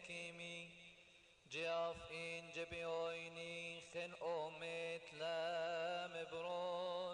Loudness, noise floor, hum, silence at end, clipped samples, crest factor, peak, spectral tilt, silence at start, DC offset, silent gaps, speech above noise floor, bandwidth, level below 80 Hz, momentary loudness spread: -46 LUFS; -68 dBFS; none; 0 s; under 0.1%; 14 dB; -34 dBFS; -3.5 dB/octave; 0 s; under 0.1%; none; 22 dB; 10.5 kHz; -78 dBFS; 9 LU